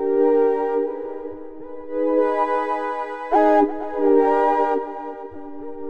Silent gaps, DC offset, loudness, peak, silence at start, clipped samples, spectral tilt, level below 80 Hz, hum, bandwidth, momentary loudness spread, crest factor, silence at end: none; under 0.1%; -20 LUFS; -6 dBFS; 0 s; under 0.1%; -6.5 dB/octave; -56 dBFS; none; 6.6 kHz; 19 LU; 14 dB; 0 s